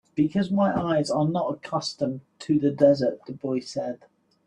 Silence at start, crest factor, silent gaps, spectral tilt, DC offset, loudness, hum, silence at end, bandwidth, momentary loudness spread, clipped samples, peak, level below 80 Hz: 0.15 s; 18 dB; none; -6.5 dB/octave; under 0.1%; -25 LUFS; none; 0.5 s; 10.5 kHz; 12 LU; under 0.1%; -6 dBFS; -62 dBFS